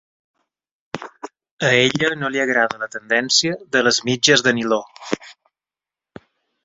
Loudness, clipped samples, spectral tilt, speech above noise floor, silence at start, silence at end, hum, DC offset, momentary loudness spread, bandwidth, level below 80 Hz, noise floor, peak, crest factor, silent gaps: -18 LUFS; under 0.1%; -2.5 dB/octave; 71 dB; 0.95 s; 1.3 s; none; under 0.1%; 18 LU; 8 kHz; -62 dBFS; -90 dBFS; 0 dBFS; 22 dB; 1.51-1.57 s